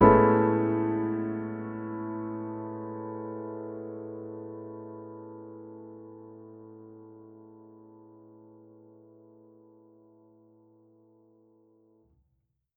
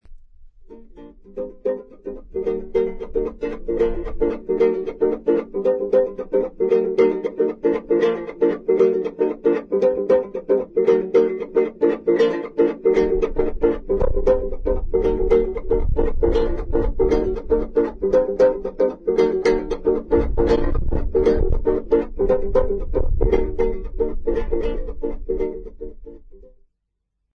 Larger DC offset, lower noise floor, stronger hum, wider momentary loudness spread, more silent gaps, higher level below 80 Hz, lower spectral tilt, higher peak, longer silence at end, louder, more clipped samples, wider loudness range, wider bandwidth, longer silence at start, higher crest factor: neither; about the same, -76 dBFS vs -76 dBFS; neither; first, 26 LU vs 8 LU; neither; second, -54 dBFS vs -28 dBFS; about the same, -9 dB/octave vs -8.5 dB/octave; about the same, -6 dBFS vs -4 dBFS; first, 4.8 s vs 1.2 s; second, -30 LUFS vs -21 LUFS; neither; first, 24 LU vs 6 LU; second, 3.6 kHz vs 6.6 kHz; about the same, 0 s vs 0.1 s; first, 26 dB vs 16 dB